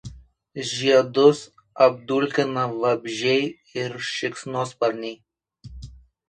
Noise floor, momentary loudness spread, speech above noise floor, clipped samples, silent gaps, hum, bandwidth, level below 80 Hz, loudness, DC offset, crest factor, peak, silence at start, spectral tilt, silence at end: -46 dBFS; 20 LU; 24 dB; under 0.1%; none; none; 10 kHz; -52 dBFS; -22 LUFS; under 0.1%; 20 dB; -2 dBFS; 0.05 s; -4.5 dB/octave; 0.35 s